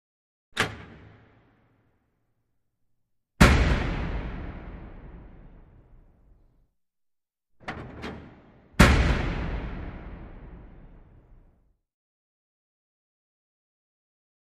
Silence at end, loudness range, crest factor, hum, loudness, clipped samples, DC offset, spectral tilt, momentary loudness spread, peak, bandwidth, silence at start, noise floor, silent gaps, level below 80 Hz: 3.6 s; 18 LU; 28 dB; none; -25 LUFS; under 0.1%; under 0.1%; -5.5 dB/octave; 27 LU; -2 dBFS; 14.5 kHz; 0.55 s; -80 dBFS; none; -34 dBFS